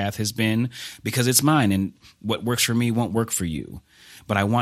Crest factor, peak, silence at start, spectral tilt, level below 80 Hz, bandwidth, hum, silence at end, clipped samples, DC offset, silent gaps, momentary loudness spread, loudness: 20 dB; -2 dBFS; 0 s; -4.5 dB/octave; -54 dBFS; 16 kHz; none; 0 s; under 0.1%; under 0.1%; none; 13 LU; -22 LUFS